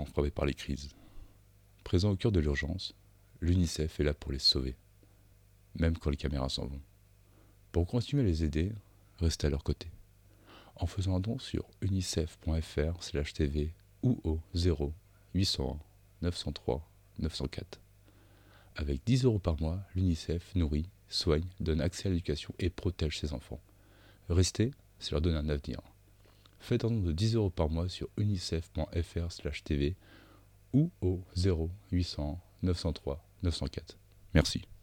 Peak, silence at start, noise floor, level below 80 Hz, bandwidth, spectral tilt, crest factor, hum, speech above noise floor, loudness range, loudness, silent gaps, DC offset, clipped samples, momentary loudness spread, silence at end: -12 dBFS; 0 s; -61 dBFS; -44 dBFS; 13.5 kHz; -6 dB/octave; 22 dB; 50 Hz at -60 dBFS; 29 dB; 4 LU; -33 LUFS; none; under 0.1%; under 0.1%; 11 LU; 0.05 s